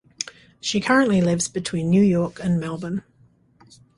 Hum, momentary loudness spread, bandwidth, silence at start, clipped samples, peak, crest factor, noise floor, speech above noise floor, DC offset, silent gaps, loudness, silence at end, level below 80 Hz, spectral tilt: none; 14 LU; 11.5 kHz; 0.2 s; under 0.1%; -4 dBFS; 18 dB; -57 dBFS; 37 dB; under 0.1%; none; -22 LUFS; 1 s; -54 dBFS; -5 dB/octave